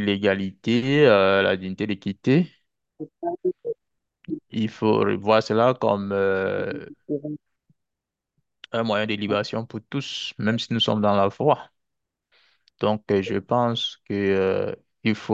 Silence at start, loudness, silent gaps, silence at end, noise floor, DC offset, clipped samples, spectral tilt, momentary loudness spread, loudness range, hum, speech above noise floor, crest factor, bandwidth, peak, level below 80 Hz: 0 s; -23 LUFS; none; 0 s; -85 dBFS; under 0.1%; under 0.1%; -6.5 dB/octave; 12 LU; 6 LU; none; 62 dB; 20 dB; 8 kHz; -4 dBFS; -56 dBFS